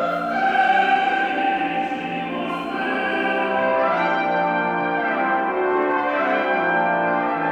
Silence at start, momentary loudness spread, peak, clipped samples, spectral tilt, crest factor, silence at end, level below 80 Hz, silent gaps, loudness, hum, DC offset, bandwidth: 0 s; 7 LU; -8 dBFS; under 0.1%; -6 dB/octave; 14 dB; 0 s; -60 dBFS; none; -20 LUFS; none; under 0.1%; 8.6 kHz